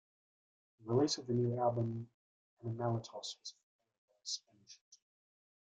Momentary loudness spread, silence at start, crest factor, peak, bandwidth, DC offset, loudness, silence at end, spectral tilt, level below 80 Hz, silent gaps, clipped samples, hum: 19 LU; 0.8 s; 20 dB; -20 dBFS; 9.2 kHz; under 0.1%; -38 LUFS; 0.75 s; -6 dB/octave; -78 dBFS; 2.14-2.57 s, 3.63-3.79 s, 3.98-4.08 s, 4.81-4.92 s; under 0.1%; none